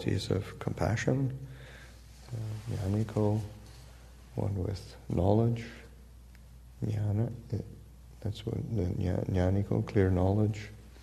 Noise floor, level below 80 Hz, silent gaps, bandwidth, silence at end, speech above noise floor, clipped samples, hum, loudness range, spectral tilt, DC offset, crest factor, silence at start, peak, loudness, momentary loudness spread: -52 dBFS; -50 dBFS; none; 13 kHz; 0 s; 22 dB; under 0.1%; none; 5 LU; -7.5 dB/octave; under 0.1%; 20 dB; 0 s; -12 dBFS; -32 LUFS; 21 LU